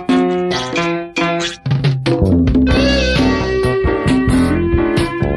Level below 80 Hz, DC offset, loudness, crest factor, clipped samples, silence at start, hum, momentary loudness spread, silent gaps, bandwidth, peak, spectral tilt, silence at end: -24 dBFS; under 0.1%; -15 LUFS; 10 dB; under 0.1%; 0 s; none; 5 LU; none; 12 kHz; -4 dBFS; -6.5 dB/octave; 0 s